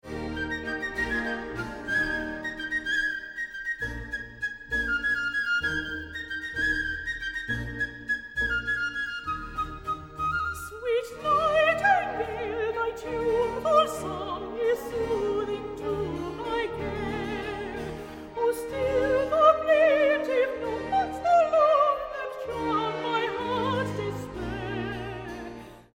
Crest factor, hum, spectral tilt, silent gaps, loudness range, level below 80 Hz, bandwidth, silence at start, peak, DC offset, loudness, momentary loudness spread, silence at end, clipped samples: 20 dB; none; -5 dB/octave; none; 6 LU; -48 dBFS; 17 kHz; 0.05 s; -8 dBFS; under 0.1%; -27 LUFS; 13 LU; 0.15 s; under 0.1%